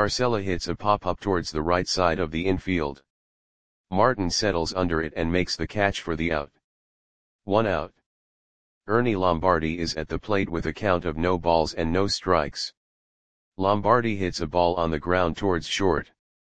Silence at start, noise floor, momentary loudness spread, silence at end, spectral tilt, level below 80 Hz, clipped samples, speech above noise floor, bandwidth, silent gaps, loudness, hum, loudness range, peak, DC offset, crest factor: 0 s; under -90 dBFS; 7 LU; 0.4 s; -5 dB/octave; -44 dBFS; under 0.1%; over 66 dB; 9.8 kHz; 3.10-3.84 s, 6.64-7.39 s, 8.06-8.81 s, 12.77-13.52 s; -25 LUFS; none; 3 LU; -4 dBFS; 0.9%; 22 dB